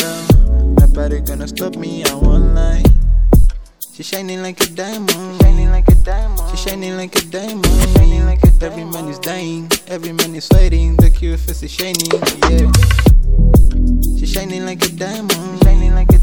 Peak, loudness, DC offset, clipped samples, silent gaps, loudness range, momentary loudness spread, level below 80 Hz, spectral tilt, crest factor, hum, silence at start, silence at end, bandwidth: 0 dBFS; -15 LUFS; under 0.1%; 0.2%; none; 3 LU; 11 LU; -12 dBFS; -5.5 dB/octave; 10 dB; none; 0 s; 0 s; 18.5 kHz